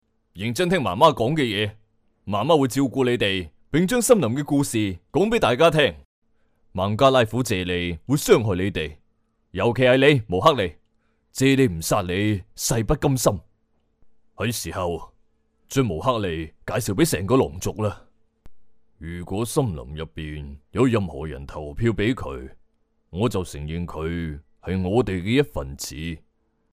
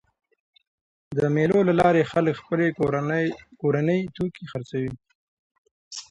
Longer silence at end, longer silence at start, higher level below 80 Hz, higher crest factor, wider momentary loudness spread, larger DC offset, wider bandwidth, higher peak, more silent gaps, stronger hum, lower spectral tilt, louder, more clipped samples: first, 0.55 s vs 0.1 s; second, 0.35 s vs 1.1 s; first, -44 dBFS vs -56 dBFS; about the same, 20 dB vs 18 dB; first, 16 LU vs 12 LU; neither; first, 16 kHz vs 11 kHz; first, -2 dBFS vs -6 dBFS; second, 6.05-6.22 s vs 5.15-5.65 s, 5.71-5.91 s; neither; second, -5 dB/octave vs -7.5 dB/octave; about the same, -22 LUFS vs -24 LUFS; neither